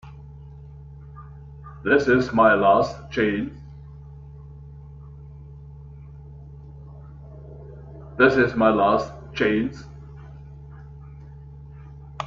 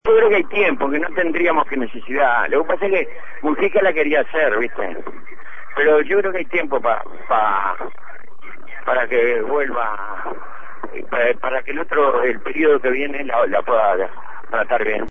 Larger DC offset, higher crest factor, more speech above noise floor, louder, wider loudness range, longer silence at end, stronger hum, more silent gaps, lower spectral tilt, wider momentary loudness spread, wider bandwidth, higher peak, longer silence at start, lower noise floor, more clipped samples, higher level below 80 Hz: second, under 0.1% vs 7%; first, 22 dB vs 14 dB; about the same, 22 dB vs 23 dB; about the same, -20 LUFS vs -19 LUFS; first, 21 LU vs 3 LU; about the same, 0 s vs 0 s; neither; neither; about the same, -7 dB/octave vs -7 dB/octave; first, 25 LU vs 13 LU; first, 7.4 kHz vs 3.7 kHz; about the same, -2 dBFS vs -4 dBFS; about the same, 0.05 s vs 0 s; about the same, -41 dBFS vs -42 dBFS; neither; first, -46 dBFS vs -56 dBFS